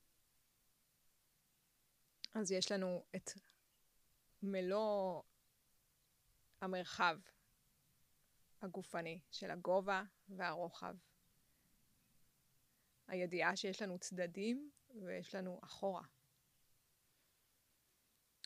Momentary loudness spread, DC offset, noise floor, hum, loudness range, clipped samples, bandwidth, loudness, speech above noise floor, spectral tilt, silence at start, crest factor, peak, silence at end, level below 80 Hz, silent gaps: 14 LU; under 0.1%; -79 dBFS; none; 6 LU; under 0.1%; 15.5 kHz; -43 LUFS; 37 dB; -4 dB/octave; 2.3 s; 26 dB; -22 dBFS; 2.4 s; -84 dBFS; none